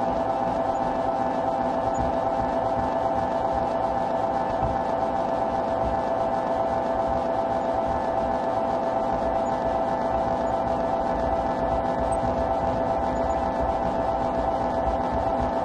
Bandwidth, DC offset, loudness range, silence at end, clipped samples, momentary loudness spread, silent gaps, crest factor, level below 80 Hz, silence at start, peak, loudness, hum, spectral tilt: 10.5 kHz; under 0.1%; 0 LU; 0 s; under 0.1%; 0 LU; none; 12 dB; -40 dBFS; 0 s; -12 dBFS; -25 LUFS; none; -7 dB/octave